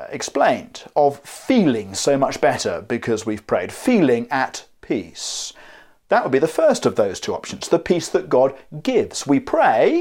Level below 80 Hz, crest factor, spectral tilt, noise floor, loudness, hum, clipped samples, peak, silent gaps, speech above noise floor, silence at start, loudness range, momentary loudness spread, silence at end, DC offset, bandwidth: -56 dBFS; 18 dB; -4.5 dB/octave; -46 dBFS; -20 LUFS; none; under 0.1%; -2 dBFS; none; 27 dB; 0 s; 2 LU; 10 LU; 0 s; under 0.1%; 16.5 kHz